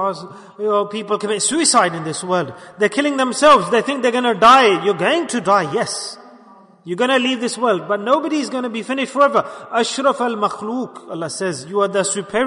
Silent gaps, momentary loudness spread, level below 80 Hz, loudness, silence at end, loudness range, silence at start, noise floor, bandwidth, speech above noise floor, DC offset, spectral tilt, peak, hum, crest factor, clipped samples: none; 13 LU; -58 dBFS; -17 LUFS; 0 s; 5 LU; 0 s; -46 dBFS; 11 kHz; 28 dB; under 0.1%; -3 dB/octave; -2 dBFS; none; 16 dB; under 0.1%